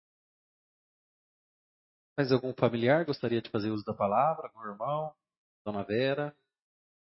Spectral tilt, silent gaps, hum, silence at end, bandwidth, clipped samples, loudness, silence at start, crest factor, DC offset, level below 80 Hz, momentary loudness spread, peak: -10 dB/octave; 5.38-5.65 s; none; 0.7 s; 6 kHz; under 0.1%; -31 LUFS; 2.2 s; 22 dB; under 0.1%; -74 dBFS; 12 LU; -10 dBFS